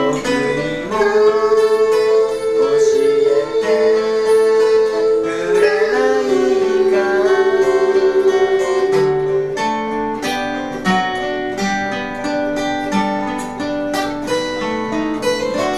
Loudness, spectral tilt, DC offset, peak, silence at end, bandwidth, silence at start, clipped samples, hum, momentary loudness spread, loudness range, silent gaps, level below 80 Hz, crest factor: -16 LUFS; -4.5 dB/octave; under 0.1%; -2 dBFS; 0 s; 13.5 kHz; 0 s; under 0.1%; none; 7 LU; 5 LU; none; -44 dBFS; 14 dB